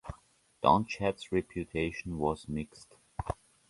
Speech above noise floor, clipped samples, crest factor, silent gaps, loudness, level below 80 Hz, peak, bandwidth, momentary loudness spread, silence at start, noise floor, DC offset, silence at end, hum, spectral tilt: 31 dB; under 0.1%; 24 dB; none; -33 LUFS; -50 dBFS; -10 dBFS; 11.5 kHz; 19 LU; 0.05 s; -62 dBFS; under 0.1%; 0.35 s; none; -6.5 dB/octave